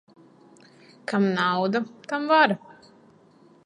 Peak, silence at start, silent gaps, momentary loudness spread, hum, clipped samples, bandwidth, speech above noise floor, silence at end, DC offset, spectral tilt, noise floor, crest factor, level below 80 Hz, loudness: -4 dBFS; 1.1 s; none; 12 LU; none; under 0.1%; 10.5 kHz; 33 dB; 1.1 s; under 0.1%; -6 dB/octave; -55 dBFS; 22 dB; -76 dBFS; -23 LUFS